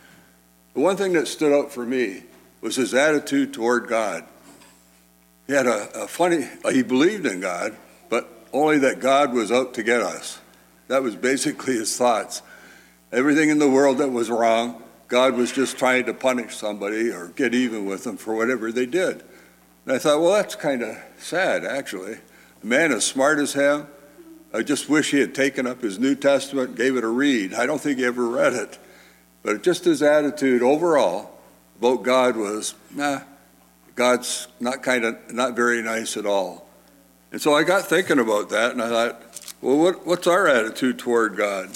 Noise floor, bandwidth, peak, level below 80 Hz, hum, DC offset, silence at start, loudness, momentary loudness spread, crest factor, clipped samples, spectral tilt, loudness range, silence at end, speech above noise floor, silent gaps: -56 dBFS; 17 kHz; -6 dBFS; -68 dBFS; 60 Hz at -60 dBFS; under 0.1%; 0.75 s; -21 LUFS; 11 LU; 16 dB; under 0.1%; -3.5 dB/octave; 4 LU; 0 s; 35 dB; none